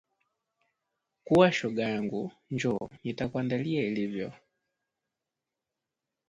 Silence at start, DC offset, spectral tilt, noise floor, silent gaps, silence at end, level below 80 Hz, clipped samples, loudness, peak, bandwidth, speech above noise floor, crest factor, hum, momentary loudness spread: 1.25 s; under 0.1%; -6.5 dB/octave; -88 dBFS; none; 1.95 s; -64 dBFS; under 0.1%; -29 LUFS; -8 dBFS; 11 kHz; 59 dB; 24 dB; none; 14 LU